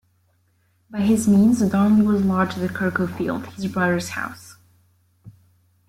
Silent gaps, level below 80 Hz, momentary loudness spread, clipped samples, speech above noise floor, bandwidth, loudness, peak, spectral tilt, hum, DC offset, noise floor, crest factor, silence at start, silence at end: none; -56 dBFS; 13 LU; under 0.1%; 44 dB; 15 kHz; -20 LUFS; -6 dBFS; -6.5 dB/octave; none; under 0.1%; -64 dBFS; 14 dB; 0.9 s; 0.6 s